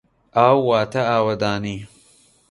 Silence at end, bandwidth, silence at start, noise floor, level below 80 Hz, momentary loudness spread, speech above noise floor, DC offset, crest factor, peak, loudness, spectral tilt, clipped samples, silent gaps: 0.65 s; 11.5 kHz; 0.35 s; -55 dBFS; -54 dBFS; 12 LU; 37 dB; under 0.1%; 20 dB; 0 dBFS; -19 LUFS; -6.5 dB/octave; under 0.1%; none